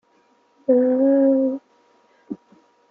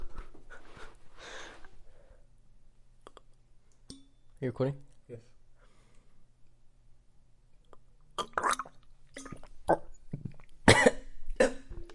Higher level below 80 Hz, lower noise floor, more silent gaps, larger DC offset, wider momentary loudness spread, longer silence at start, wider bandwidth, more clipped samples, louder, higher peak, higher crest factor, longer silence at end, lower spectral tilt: second, -78 dBFS vs -48 dBFS; about the same, -60 dBFS vs -58 dBFS; neither; neither; second, 21 LU vs 28 LU; first, 0.7 s vs 0 s; second, 2.2 kHz vs 11.5 kHz; neither; first, -19 LUFS vs -30 LUFS; about the same, -6 dBFS vs -4 dBFS; second, 16 dB vs 30 dB; first, 0.55 s vs 0 s; first, -9.5 dB/octave vs -4 dB/octave